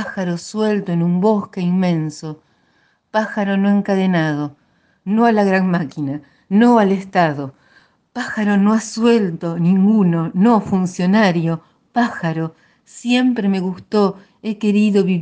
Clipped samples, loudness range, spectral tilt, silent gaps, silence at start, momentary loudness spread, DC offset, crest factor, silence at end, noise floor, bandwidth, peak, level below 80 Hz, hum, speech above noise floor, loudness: under 0.1%; 4 LU; -7 dB/octave; none; 0 s; 13 LU; under 0.1%; 16 dB; 0 s; -60 dBFS; 9.2 kHz; 0 dBFS; -60 dBFS; none; 44 dB; -17 LUFS